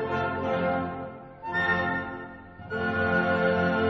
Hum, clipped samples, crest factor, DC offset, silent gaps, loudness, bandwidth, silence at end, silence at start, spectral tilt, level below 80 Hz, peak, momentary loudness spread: none; under 0.1%; 16 dB; under 0.1%; none; -27 LUFS; 7.6 kHz; 0 s; 0 s; -7.5 dB/octave; -56 dBFS; -12 dBFS; 16 LU